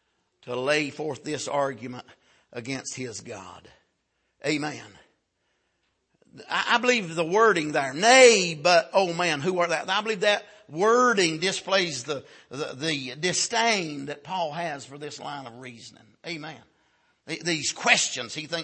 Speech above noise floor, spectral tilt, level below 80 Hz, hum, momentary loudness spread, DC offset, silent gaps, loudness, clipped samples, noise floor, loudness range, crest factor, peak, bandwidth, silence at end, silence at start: 50 dB; -2.5 dB/octave; -74 dBFS; none; 18 LU; under 0.1%; none; -23 LUFS; under 0.1%; -75 dBFS; 15 LU; 24 dB; -2 dBFS; 8.8 kHz; 0 s; 0.45 s